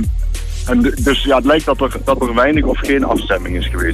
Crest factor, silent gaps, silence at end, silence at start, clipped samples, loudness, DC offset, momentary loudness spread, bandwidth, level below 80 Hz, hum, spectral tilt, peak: 12 dB; none; 0 s; 0 s; under 0.1%; -15 LUFS; under 0.1%; 8 LU; 14 kHz; -22 dBFS; none; -5.5 dB/octave; -2 dBFS